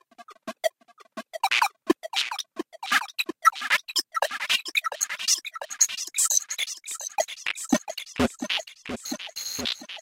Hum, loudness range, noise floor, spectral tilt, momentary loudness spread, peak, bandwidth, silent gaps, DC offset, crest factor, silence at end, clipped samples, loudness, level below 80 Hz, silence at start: none; 4 LU; -50 dBFS; -0.5 dB/octave; 13 LU; -6 dBFS; 16.5 kHz; none; under 0.1%; 22 dB; 0 s; under 0.1%; -26 LUFS; -58 dBFS; 0.2 s